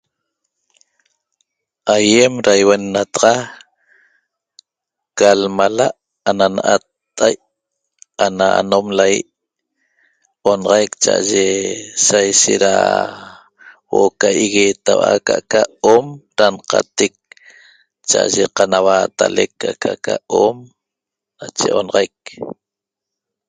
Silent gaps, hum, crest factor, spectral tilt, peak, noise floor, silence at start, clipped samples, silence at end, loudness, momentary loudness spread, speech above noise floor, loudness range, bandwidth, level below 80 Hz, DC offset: none; none; 16 dB; -2.5 dB/octave; 0 dBFS; -84 dBFS; 1.85 s; under 0.1%; 0.95 s; -15 LUFS; 13 LU; 70 dB; 4 LU; 9.6 kHz; -56 dBFS; under 0.1%